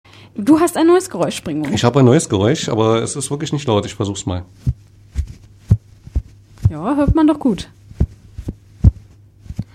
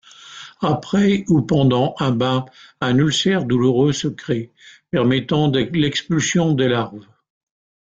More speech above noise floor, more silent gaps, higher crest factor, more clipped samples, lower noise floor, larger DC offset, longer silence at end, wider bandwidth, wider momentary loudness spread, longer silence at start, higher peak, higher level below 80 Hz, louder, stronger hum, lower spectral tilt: first, 28 dB vs 22 dB; neither; about the same, 16 dB vs 14 dB; neither; about the same, -43 dBFS vs -40 dBFS; neither; second, 0.1 s vs 0.9 s; first, 15 kHz vs 9 kHz; first, 18 LU vs 9 LU; about the same, 0.35 s vs 0.25 s; first, 0 dBFS vs -4 dBFS; first, -28 dBFS vs -52 dBFS; about the same, -17 LUFS vs -18 LUFS; neither; about the same, -6 dB/octave vs -5.5 dB/octave